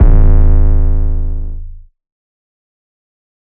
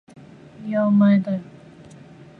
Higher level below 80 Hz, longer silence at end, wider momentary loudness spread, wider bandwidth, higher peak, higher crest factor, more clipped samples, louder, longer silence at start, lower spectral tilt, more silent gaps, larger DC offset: first, -10 dBFS vs -64 dBFS; first, 1.65 s vs 0.95 s; about the same, 16 LU vs 14 LU; second, 2 kHz vs 4.5 kHz; first, 0 dBFS vs -8 dBFS; about the same, 10 dB vs 14 dB; first, 0.6% vs under 0.1%; first, -15 LUFS vs -19 LUFS; second, 0 s vs 0.6 s; first, -13 dB/octave vs -9.5 dB/octave; neither; neither